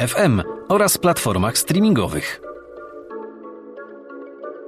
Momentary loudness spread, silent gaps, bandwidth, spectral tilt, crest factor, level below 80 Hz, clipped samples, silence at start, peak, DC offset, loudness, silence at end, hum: 21 LU; none; 15.5 kHz; -4.5 dB/octave; 14 dB; -46 dBFS; under 0.1%; 0 s; -6 dBFS; under 0.1%; -18 LUFS; 0 s; none